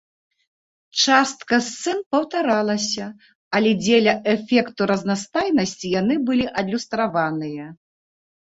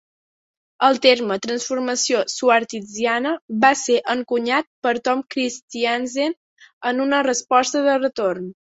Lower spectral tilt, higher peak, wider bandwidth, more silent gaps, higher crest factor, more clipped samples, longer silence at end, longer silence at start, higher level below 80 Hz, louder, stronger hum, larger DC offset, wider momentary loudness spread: first, -4 dB/octave vs -2.5 dB/octave; about the same, -2 dBFS vs -2 dBFS; about the same, 8 kHz vs 8.2 kHz; second, 2.06-2.11 s, 3.35-3.51 s vs 3.41-3.48 s, 4.67-4.82 s, 5.62-5.68 s, 6.37-6.57 s, 6.73-6.81 s; about the same, 18 dB vs 20 dB; neither; first, 0.75 s vs 0.2 s; first, 0.95 s vs 0.8 s; first, -60 dBFS vs -68 dBFS; about the same, -20 LUFS vs -20 LUFS; neither; neither; about the same, 9 LU vs 8 LU